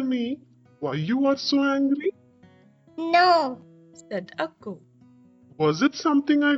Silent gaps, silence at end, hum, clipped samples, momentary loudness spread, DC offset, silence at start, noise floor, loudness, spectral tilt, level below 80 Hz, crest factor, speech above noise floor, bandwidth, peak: none; 0 s; none; under 0.1%; 18 LU; under 0.1%; 0 s; -55 dBFS; -24 LUFS; -5.5 dB/octave; -70 dBFS; 18 dB; 33 dB; 8 kHz; -8 dBFS